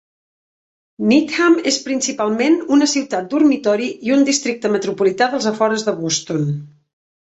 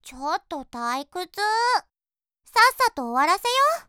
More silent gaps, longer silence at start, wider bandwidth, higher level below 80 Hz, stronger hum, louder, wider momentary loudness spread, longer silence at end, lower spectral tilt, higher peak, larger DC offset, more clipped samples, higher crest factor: neither; first, 1 s vs 0.05 s; second, 8.2 kHz vs over 20 kHz; about the same, -62 dBFS vs -60 dBFS; neither; first, -17 LUFS vs -22 LUFS; second, 6 LU vs 11 LU; first, 0.55 s vs 0.05 s; first, -4 dB/octave vs -0.5 dB/octave; about the same, -2 dBFS vs -4 dBFS; neither; neither; about the same, 16 dB vs 20 dB